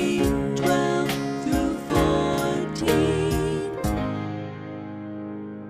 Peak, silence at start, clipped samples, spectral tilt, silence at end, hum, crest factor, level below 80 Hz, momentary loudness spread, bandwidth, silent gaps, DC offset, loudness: -8 dBFS; 0 s; under 0.1%; -6 dB/octave; 0 s; none; 16 dB; -38 dBFS; 13 LU; 15.5 kHz; none; under 0.1%; -24 LUFS